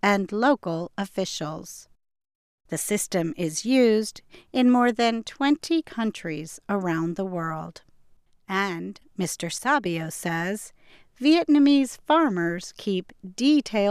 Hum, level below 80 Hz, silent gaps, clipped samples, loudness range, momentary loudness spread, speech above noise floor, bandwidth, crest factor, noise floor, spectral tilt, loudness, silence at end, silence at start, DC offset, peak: none; -62 dBFS; 2.35-2.58 s; under 0.1%; 6 LU; 14 LU; 32 dB; 15.5 kHz; 18 dB; -56 dBFS; -4.5 dB/octave; -24 LUFS; 0 s; 0.05 s; under 0.1%; -6 dBFS